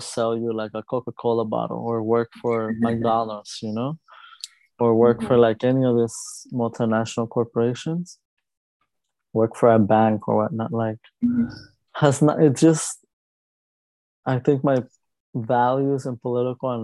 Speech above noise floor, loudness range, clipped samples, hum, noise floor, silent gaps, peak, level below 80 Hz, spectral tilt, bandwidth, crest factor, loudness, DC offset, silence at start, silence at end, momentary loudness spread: 59 dB; 4 LU; under 0.1%; none; -81 dBFS; 8.25-8.37 s, 8.57-8.80 s, 13.13-14.23 s, 15.20-15.33 s; -2 dBFS; -60 dBFS; -6.5 dB/octave; 12 kHz; 20 dB; -22 LUFS; under 0.1%; 0 s; 0 s; 13 LU